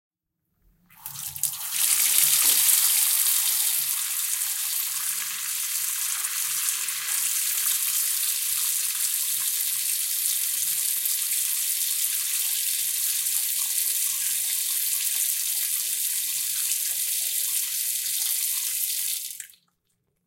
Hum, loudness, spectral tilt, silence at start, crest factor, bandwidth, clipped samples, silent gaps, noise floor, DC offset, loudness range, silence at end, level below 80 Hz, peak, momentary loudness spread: none; -22 LUFS; 4 dB/octave; 1 s; 26 dB; 17 kHz; under 0.1%; none; -77 dBFS; under 0.1%; 5 LU; 0.8 s; -76 dBFS; 0 dBFS; 7 LU